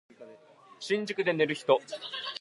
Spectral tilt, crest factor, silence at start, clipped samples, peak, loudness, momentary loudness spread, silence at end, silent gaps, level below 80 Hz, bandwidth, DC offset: -4.5 dB/octave; 20 dB; 0.2 s; under 0.1%; -10 dBFS; -29 LUFS; 10 LU; 0.05 s; none; -86 dBFS; 11.5 kHz; under 0.1%